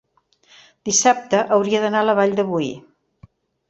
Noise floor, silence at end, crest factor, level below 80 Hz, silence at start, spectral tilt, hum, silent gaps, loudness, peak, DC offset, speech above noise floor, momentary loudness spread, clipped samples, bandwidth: -58 dBFS; 0.9 s; 18 dB; -62 dBFS; 0.85 s; -3 dB/octave; none; none; -18 LUFS; -2 dBFS; under 0.1%; 40 dB; 12 LU; under 0.1%; 8.2 kHz